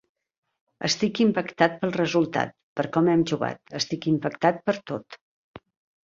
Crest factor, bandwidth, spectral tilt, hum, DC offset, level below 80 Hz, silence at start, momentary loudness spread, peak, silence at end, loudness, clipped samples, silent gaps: 22 dB; 7.6 kHz; -5 dB/octave; none; under 0.1%; -64 dBFS; 0.8 s; 9 LU; -4 dBFS; 0.45 s; -25 LUFS; under 0.1%; 2.63-2.76 s, 5.21-5.54 s